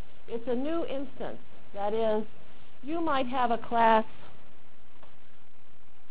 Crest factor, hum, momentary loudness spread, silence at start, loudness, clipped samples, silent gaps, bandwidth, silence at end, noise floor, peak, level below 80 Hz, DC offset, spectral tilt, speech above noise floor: 22 dB; none; 20 LU; 0.3 s; -30 LUFS; under 0.1%; none; 4 kHz; 1.85 s; -61 dBFS; -12 dBFS; -60 dBFS; 4%; -8.5 dB/octave; 32 dB